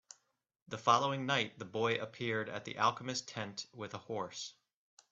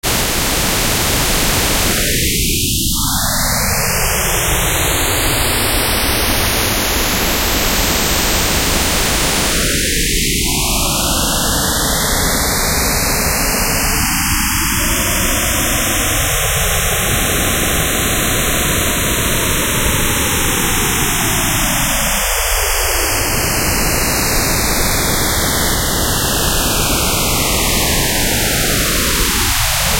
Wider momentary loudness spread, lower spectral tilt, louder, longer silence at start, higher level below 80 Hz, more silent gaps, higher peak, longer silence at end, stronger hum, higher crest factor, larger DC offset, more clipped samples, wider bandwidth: first, 14 LU vs 1 LU; first, -4 dB/octave vs -2.5 dB/octave; second, -36 LUFS vs -14 LUFS; first, 0.7 s vs 0.05 s; second, -78 dBFS vs -22 dBFS; neither; second, -14 dBFS vs 0 dBFS; first, 0.6 s vs 0 s; neither; first, 24 dB vs 14 dB; second, under 0.1% vs 0.6%; neither; second, 8.2 kHz vs 16 kHz